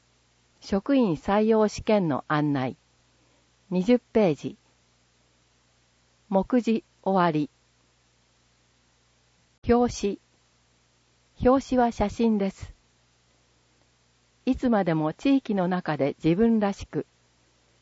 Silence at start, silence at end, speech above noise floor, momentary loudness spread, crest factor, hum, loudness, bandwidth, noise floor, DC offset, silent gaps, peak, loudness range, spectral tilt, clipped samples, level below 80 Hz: 0.65 s; 0.8 s; 41 dB; 11 LU; 18 dB; 60 Hz at -55 dBFS; -25 LUFS; 8 kHz; -65 dBFS; under 0.1%; 9.58-9.62 s; -8 dBFS; 4 LU; -7 dB/octave; under 0.1%; -50 dBFS